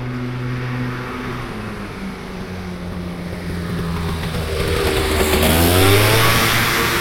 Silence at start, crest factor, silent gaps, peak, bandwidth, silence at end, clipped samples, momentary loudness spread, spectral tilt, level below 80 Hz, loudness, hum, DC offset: 0 s; 18 dB; none; -2 dBFS; 16.5 kHz; 0 s; under 0.1%; 16 LU; -4 dB/octave; -32 dBFS; -18 LUFS; none; under 0.1%